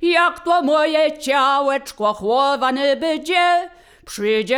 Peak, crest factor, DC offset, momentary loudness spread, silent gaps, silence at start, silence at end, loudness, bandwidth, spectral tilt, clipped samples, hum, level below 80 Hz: -4 dBFS; 14 dB; under 0.1%; 6 LU; none; 0 s; 0 s; -18 LUFS; 19.5 kHz; -3 dB/octave; under 0.1%; none; -56 dBFS